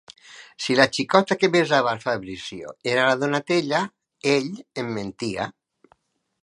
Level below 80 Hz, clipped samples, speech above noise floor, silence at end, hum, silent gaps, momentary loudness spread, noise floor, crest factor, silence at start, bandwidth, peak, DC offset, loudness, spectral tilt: -62 dBFS; under 0.1%; 41 dB; 0.95 s; none; none; 14 LU; -63 dBFS; 24 dB; 0.1 s; 11.5 kHz; 0 dBFS; under 0.1%; -22 LUFS; -4.5 dB/octave